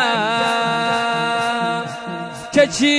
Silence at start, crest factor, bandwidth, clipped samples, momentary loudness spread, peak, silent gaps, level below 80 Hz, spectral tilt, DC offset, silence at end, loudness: 0 s; 16 dB; 11 kHz; under 0.1%; 11 LU; -2 dBFS; none; -56 dBFS; -3.5 dB/octave; under 0.1%; 0 s; -19 LUFS